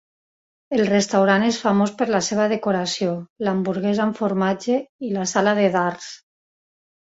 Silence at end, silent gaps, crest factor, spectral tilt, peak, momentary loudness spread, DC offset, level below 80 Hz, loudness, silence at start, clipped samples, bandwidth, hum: 0.95 s; 3.30-3.36 s, 4.89-4.99 s; 18 dB; -5 dB/octave; -4 dBFS; 8 LU; under 0.1%; -62 dBFS; -21 LUFS; 0.7 s; under 0.1%; 8 kHz; none